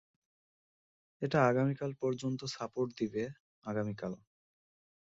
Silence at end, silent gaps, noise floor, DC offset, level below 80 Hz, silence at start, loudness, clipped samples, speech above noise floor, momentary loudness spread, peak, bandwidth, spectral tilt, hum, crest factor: 0.85 s; 3.40-3.62 s; under -90 dBFS; under 0.1%; -72 dBFS; 1.2 s; -35 LUFS; under 0.1%; over 56 dB; 14 LU; -16 dBFS; 8 kHz; -6.5 dB/octave; none; 22 dB